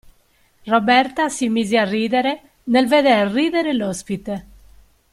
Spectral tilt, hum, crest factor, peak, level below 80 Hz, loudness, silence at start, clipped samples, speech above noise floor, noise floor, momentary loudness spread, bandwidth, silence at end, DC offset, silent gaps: -4.5 dB/octave; none; 16 dB; -2 dBFS; -54 dBFS; -18 LUFS; 0.65 s; under 0.1%; 40 dB; -58 dBFS; 12 LU; 14 kHz; 0.7 s; under 0.1%; none